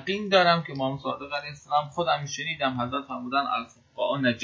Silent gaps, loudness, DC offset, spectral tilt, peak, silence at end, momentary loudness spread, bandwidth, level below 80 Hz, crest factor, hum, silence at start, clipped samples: none; -27 LUFS; under 0.1%; -4.5 dB/octave; -8 dBFS; 0 s; 11 LU; 7.6 kHz; -62 dBFS; 20 dB; none; 0 s; under 0.1%